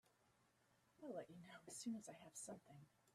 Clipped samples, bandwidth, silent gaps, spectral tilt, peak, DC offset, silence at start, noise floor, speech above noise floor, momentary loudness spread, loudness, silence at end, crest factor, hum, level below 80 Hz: under 0.1%; 14 kHz; none; -4 dB/octave; -40 dBFS; under 0.1%; 0.05 s; -80 dBFS; 24 dB; 10 LU; -55 LUFS; 0.05 s; 18 dB; none; under -90 dBFS